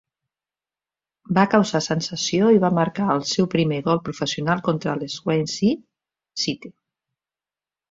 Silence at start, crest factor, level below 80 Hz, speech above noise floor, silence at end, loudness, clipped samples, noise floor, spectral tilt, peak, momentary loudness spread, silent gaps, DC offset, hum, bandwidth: 1.3 s; 20 dB; -60 dBFS; over 69 dB; 1.2 s; -21 LUFS; under 0.1%; under -90 dBFS; -5 dB/octave; -2 dBFS; 9 LU; none; under 0.1%; 50 Hz at -45 dBFS; 7.8 kHz